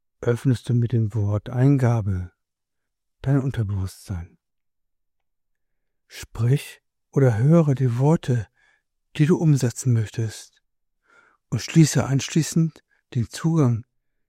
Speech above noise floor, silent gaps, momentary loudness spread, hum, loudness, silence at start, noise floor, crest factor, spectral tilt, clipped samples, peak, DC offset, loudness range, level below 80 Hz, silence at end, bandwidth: 62 dB; none; 16 LU; none; -22 LUFS; 0.2 s; -82 dBFS; 20 dB; -7 dB/octave; under 0.1%; -4 dBFS; under 0.1%; 9 LU; -54 dBFS; 0.45 s; 15 kHz